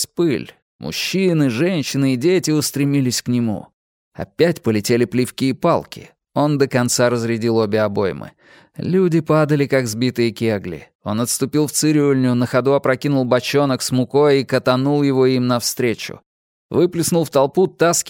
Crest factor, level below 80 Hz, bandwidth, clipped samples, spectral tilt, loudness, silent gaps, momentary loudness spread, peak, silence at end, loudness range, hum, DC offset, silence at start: 16 dB; -58 dBFS; 17 kHz; under 0.1%; -5 dB/octave; -18 LUFS; 0.62-0.79 s, 3.73-4.11 s, 10.95-10.99 s, 16.26-16.69 s; 9 LU; -2 dBFS; 0 s; 3 LU; none; under 0.1%; 0 s